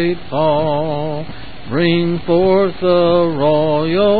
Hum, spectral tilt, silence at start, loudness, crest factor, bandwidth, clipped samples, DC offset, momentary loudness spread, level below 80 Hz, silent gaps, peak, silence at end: none; -12.5 dB/octave; 0 s; -15 LUFS; 12 dB; 4.8 kHz; under 0.1%; 4%; 10 LU; -42 dBFS; none; -2 dBFS; 0 s